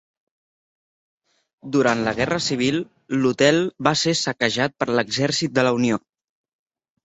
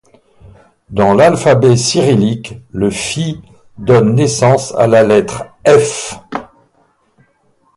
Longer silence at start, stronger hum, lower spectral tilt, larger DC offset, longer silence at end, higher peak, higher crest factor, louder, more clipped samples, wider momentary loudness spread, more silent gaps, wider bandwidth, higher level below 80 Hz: first, 1.65 s vs 0.9 s; neither; second, -4 dB/octave vs -5.5 dB/octave; neither; second, 1.05 s vs 1.35 s; about the same, -2 dBFS vs 0 dBFS; first, 22 dB vs 12 dB; second, -21 LUFS vs -11 LUFS; neither; second, 5 LU vs 15 LU; neither; second, 8.4 kHz vs 11.5 kHz; second, -56 dBFS vs -44 dBFS